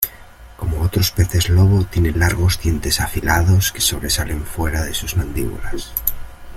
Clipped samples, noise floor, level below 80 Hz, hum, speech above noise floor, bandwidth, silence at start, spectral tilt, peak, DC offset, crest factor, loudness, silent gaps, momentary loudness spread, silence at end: under 0.1%; -40 dBFS; -28 dBFS; none; 23 dB; 16.5 kHz; 0 s; -4.5 dB/octave; 0 dBFS; under 0.1%; 18 dB; -18 LUFS; none; 11 LU; 0 s